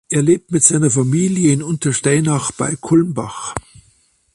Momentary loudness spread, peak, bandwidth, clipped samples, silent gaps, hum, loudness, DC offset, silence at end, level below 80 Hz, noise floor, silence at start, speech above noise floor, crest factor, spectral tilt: 13 LU; 0 dBFS; 11.5 kHz; under 0.1%; none; none; -16 LUFS; under 0.1%; 0.75 s; -50 dBFS; -57 dBFS; 0.1 s; 41 dB; 16 dB; -5 dB/octave